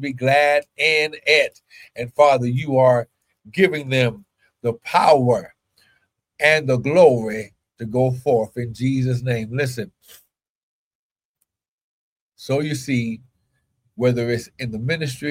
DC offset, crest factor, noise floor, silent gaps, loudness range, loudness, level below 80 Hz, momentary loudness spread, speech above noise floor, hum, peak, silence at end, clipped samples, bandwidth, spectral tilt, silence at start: under 0.1%; 20 dB; -75 dBFS; 10.50-11.16 s, 11.25-11.35 s, 11.68-12.30 s; 10 LU; -19 LUFS; -58 dBFS; 15 LU; 56 dB; none; -2 dBFS; 0 s; under 0.1%; 16 kHz; -6 dB/octave; 0 s